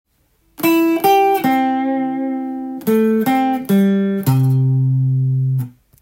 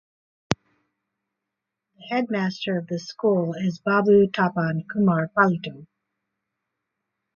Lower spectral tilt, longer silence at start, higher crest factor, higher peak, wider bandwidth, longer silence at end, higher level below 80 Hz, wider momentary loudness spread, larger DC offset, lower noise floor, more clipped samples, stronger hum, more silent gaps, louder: about the same, -7.5 dB/octave vs -7 dB/octave; about the same, 0.6 s vs 0.5 s; second, 14 dB vs 24 dB; about the same, -2 dBFS vs -2 dBFS; first, 17 kHz vs 7.4 kHz; second, 0.3 s vs 1.5 s; about the same, -60 dBFS vs -62 dBFS; second, 9 LU vs 12 LU; neither; second, -60 dBFS vs -84 dBFS; neither; neither; neither; first, -16 LUFS vs -23 LUFS